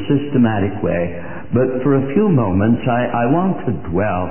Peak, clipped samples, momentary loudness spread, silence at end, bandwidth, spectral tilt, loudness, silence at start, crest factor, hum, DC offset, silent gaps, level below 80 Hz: -4 dBFS; under 0.1%; 6 LU; 0 s; 3.2 kHz; -13.5 dB/octave; -17 LUFS; 0 s; 12 dB; none; 4%; none; -38 dBFS